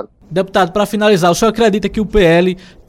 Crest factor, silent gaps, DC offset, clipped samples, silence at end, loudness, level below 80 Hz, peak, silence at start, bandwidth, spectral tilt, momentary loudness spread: 12 dB; none; under 0.1%; under 0.1%; 0.3 s; -13 LUFS; -32 dBFS; 0 dBFS; 0 s; 16.5 kHz; -5.5 dB/octave; 7 LU